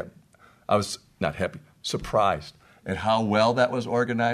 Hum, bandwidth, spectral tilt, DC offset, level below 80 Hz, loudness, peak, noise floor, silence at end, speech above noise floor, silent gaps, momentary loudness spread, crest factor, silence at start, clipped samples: none; 13.5 kHz; -5 dB/octave; under 0.1%; -52 dBFS; -25 LUFS; -8 dBFS; -57 dBFS; 0 s; 32 dB; none; 15 LU; 18 dB; 0 s; under 0.1%